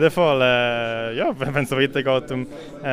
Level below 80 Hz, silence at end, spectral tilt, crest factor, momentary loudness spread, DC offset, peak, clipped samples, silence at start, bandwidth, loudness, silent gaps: -50 dBFS; 0 s; -5.5 dB/octave; 18 dB; 12 LU; under 0.1%; -4 dBFS; under 0.1%; 0 s; 15.5 kHz; -21 LUFS; none